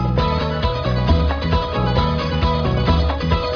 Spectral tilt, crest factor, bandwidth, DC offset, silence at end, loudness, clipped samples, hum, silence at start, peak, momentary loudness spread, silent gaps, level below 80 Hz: -7.5 dB/octave; 14 dB; 5.4 kHz; under 0.1%; 0 s; -19 LUFS; under 0.1%; none; 0 s; -4 dBFS; 2 LU; none; -22 dBFS